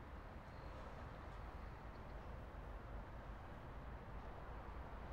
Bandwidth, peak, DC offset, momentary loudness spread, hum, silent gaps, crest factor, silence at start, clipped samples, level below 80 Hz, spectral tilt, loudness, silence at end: 15.5 kHz; -40 dBFS; under 0.1%; 1 LU; none; none; 12 dB; 0 s; under 0.1%; -56 dBFS; -7 dB/octave; -55 LUFS; 0 s